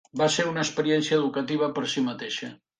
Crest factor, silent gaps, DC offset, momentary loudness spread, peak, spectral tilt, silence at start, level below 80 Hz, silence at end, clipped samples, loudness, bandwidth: 16 dB; none; under 0.1%; 8 LU; -10 dBFS; -4 dB/octave; 0.15 s; -70 dBFS; 0.25 s; under 0.1%; -26 LUFS; 9.8 kHz